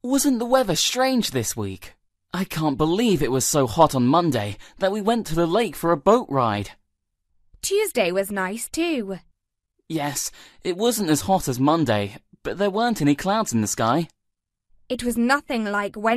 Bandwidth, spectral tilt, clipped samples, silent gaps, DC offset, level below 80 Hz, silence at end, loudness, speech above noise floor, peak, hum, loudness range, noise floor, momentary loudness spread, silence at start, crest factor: 14 kHz; -4.5 dB/octave; under 0.1%; none; under 0.1%; -48 dBFS; 0 s; -22 LUFS; 57 dB; -2 dBFS; none; 5 LU; -79 dBFS; 12 LU; 0.05 s; 20 dB